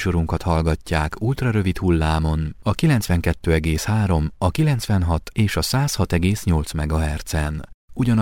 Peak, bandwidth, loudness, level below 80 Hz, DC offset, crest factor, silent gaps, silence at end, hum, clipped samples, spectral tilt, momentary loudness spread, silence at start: -4 dBFS; 17 kHz; -21 LUFS; -30 dBFS; under 0.1%; 16 dB; 7.74-7.88 s; 0 s; none; under 0.1%; -6 dB/octave; 5 LU; 0 s